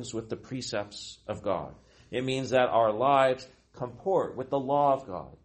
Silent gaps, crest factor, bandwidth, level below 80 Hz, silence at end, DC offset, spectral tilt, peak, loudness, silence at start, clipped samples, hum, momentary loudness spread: none; 20 dB; 8.4 kHz; -62 dBFS; 0.1 s; under 0.1%; -5 dB/octave; -10 dBFS; -28 LUFS; 0 s; under 0.1%; none; 16 LU